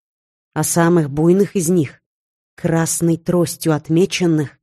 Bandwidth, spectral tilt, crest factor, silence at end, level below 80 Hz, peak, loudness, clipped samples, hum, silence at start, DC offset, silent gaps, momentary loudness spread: 13 kHz; -5.5 dB/octave; 14 dB; 0.15 s; -52 dBFS; -4 dBFS; -17 LUFS; under 0.1%; none; 0.55 s; under 0.1%; 2.06-2.57 s; 6 LU